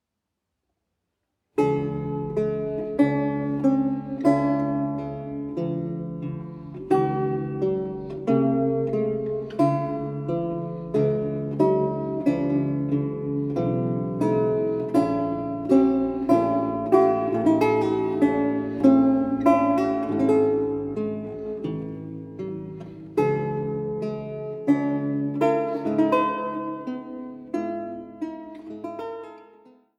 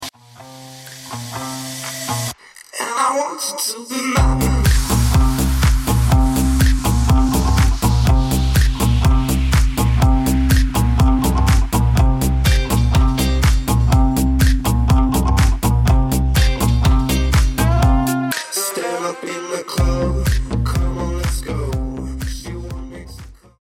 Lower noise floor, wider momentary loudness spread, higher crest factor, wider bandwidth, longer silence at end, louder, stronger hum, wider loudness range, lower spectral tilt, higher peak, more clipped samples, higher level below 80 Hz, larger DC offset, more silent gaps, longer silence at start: first, -82 dBFS vs -40 dBFS; about the same, 13 LU vs 11 LU; first, 20 dB vs 12 dB; second, 10.5 kHz vs 17 kHz; first, 0.55 s vs 0.3 s; second, -24 LUFS vs -17 LUFS; neither; about the same, 7 LU vs 6 LU; first, -9 dB/octave vs -5.5 dB/octave; about the same, -4 dBFS vs -4 dBFS; neither; second, -54 dBFS vs -18 dBFS; neither; neither; first, 1.55 s vs 0 s